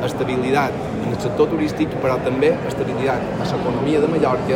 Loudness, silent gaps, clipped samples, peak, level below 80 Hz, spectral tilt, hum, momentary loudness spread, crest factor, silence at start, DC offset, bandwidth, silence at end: -20 LUFS; none; under 0.1%; -4 dBFS; -44 dBFS; -7 dB/octave; none; 5 LU; 14 dB; 0 s; under 0.1%; 16.5 kHz; 0 s